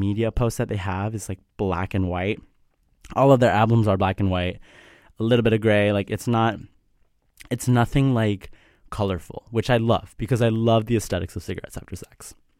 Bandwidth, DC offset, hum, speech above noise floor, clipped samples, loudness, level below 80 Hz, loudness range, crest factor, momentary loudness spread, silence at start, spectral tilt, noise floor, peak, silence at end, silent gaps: 15.5 kHz; under 0.1%; none; 41 dB; under 0.1%; -22 LUFS; -42 dBFS; 4 LU; 18 dB; 15 LU; 0 s; -6.5 dB/octave; -63 dBFS; -4 dBFS; 0.25 s; none